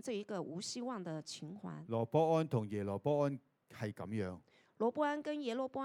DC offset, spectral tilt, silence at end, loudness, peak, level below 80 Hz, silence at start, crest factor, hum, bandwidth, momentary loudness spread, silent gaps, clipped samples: under 0.1%; -6 dB/octave; 0 s; -39 LUFS; -20 dBFS; -80 dBFS; 0.05 s; 18 dB; none; 14.5 kHz; 13 LU; none; under 0.1%